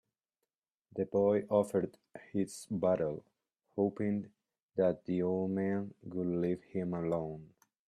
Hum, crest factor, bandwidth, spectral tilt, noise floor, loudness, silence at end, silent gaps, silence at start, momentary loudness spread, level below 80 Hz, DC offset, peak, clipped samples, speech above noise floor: none; 18 dB; 13.5 kHz; -8 dB/octave; -90 dBFS; -35 LUFS; 0.4 s; 4.62-4.69 s; 0.95 s; 13 LU; -72 dBFS; under 0.1%; -16 dBFS; under 0.1%; 56 dB